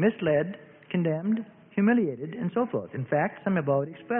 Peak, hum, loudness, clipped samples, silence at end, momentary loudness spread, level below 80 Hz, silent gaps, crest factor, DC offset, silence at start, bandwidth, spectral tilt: -12 dBFS; none; -28 LUFS; under 0.1%; 0 s; 9 LU; -68 dBFS; none; 16 dB; under 0.1%; 0 s; 3.6 kHz; -12 dB/octave